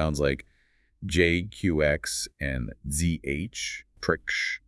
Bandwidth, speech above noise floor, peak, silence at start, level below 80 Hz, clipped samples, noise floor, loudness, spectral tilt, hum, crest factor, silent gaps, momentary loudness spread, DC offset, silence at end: 12 kHz; 38 dB; -8 dBFS; 0 s; -42 dBFS; under 0.1%; -66 dBFS; -28 LUFS; -4.5 dB/octave; none; 20 dB; none; 9 LU; under 0.1%; 0.1 s